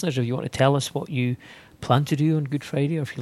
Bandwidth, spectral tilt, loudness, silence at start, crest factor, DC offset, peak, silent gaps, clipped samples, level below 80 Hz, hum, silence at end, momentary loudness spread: 13 kHz; -6.5 dB/octave; -24 LUFS; 0 s; 20 dB; under 0.1%; -4 dBFS; none; under 0.1%; -58 dBFS; none; 0 s; 7 LU